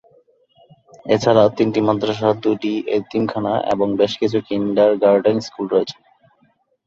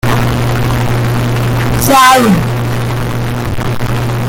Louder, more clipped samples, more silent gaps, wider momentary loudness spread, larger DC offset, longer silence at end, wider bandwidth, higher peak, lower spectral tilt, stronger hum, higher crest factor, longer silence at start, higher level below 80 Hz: second, -18 LUFS vs -11 LUFS; second, under 0.1% vs 0.1%; neither; second, 7 LU vs 11 LU; neither; first, 0.95 s vs 0 s; second, 7.6 kHz vs 17 kHz; about the same, -2 dBFS vs 0 dBFS; first, -6.5 dB/octave vs -5 dB/octave; neither; first, 16 dB vs 10 dB; first, 1.05 s vs 0.05 s; second, -56 dBFS vs -26 dBFS